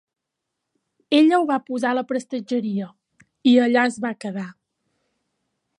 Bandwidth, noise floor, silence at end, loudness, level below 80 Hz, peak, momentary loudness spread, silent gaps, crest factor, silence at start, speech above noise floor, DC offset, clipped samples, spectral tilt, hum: 11 kHz; -81 dBFS; 1.3 s; -21 LUFS; -76 dBFS; -4 dBFS; 14 LU; none; 18 dB; 1.1 s; 62 dB; under 0.1%; under 0.1%; -5.5 dB/octave; none